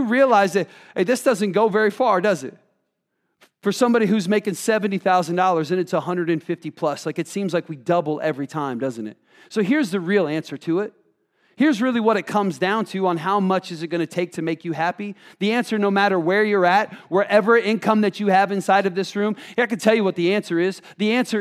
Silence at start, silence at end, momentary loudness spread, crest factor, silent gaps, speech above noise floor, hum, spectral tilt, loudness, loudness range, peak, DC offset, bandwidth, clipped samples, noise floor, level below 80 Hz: 0 s; 0 s; 8 LU; 18 dB; none; 54 dB; none; -5.5 dB/octave; -21 LUFS; 5 LU; -2 dBFS; under 0.1%; 15 kHz; under 0.1%; -74 dBFS; -78 dBFS